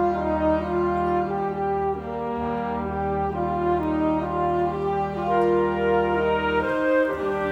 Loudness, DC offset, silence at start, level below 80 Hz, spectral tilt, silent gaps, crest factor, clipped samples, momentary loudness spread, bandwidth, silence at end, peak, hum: -24 LUFS; under 0.1%; 0 s; -42 dBFS; -8 dB/octave; none; 12 dB; under 0.1%; 5 LU; 8 kHz; 0 s; -10 dBFS; none